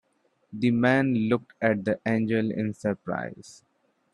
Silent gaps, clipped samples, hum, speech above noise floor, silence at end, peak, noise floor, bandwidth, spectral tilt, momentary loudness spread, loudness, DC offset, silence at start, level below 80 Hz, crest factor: none; under 0.1%; none; 44 dB; 0.6 s; -6 dBFS; -70 dBFS; 10.5 kHz; -7.5 dB/octave; 11 LU; -26 LUFS; under 0.1%; 0.5 s; -64 dBFS; 20 dB